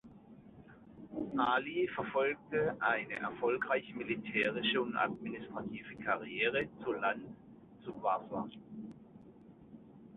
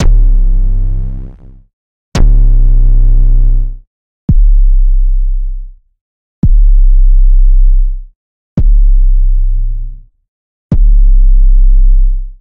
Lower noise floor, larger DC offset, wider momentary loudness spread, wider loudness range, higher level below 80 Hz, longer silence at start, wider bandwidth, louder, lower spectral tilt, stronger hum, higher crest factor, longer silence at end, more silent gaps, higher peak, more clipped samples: first, -57 dBFS vs -29 dBFS; neither; first, 19 LU vs 10 LU; about the same, 4 LU vs 3 LU; second, -70 dBFS vs -6 dBFS; about the same, 0.05 s vs 0 s; first, 4.2 kHz vs 1.6 kHz; second, -35 LUFS vs -13 LUFS; second, -2.5 dB/octave vs -8 dB/octave; neither; first, 20 dB vs 6 dB; about the same, 0 s vs 0.1 s; second, none vs 1.73-2.12 s, 3.87-4.28 s, 6.01-6.42 s, 8.15-8.56 s, 10.28-10.70 s; second, -18 dBFS vs 0 dBFS; second, under 0.1% vs 0.1%